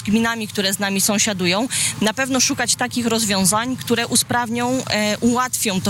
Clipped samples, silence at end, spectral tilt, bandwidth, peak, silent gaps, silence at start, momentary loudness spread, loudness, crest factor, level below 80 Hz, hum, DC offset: under 0.1%; 0 s; -2.5 dB/octave; 16.5 kHz; -8 dBFS; none; 0 s; 4 LU; -18 LUFS; 12 dB; -52 dBFS; none; under 0.1%